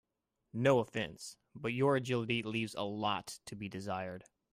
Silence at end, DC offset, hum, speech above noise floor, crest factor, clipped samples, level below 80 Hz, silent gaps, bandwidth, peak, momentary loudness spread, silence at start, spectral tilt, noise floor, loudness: 0.3 s; under 0.1%; none; 50 dB; 22 dB; under 0.1%; -72 dBFS; none; 15.5 kHz; -14 dBFS; 16 LU; 0.55 s; -5.5 dB/octave; -85 dBFS; -35 LUFS